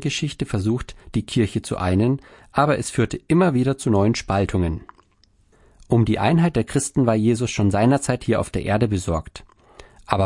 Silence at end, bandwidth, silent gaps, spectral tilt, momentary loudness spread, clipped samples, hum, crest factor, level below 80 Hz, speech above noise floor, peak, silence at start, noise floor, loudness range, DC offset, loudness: 0 s; 11.5 kHz; none; -6 dB/octave; 8 LU; under 0.1%; none; 20 dB; -42 dBFS; 39 dB; -2 dBFS; 0 s; -59 dBFS; 2 LU; under 0.1%; -21 LUFS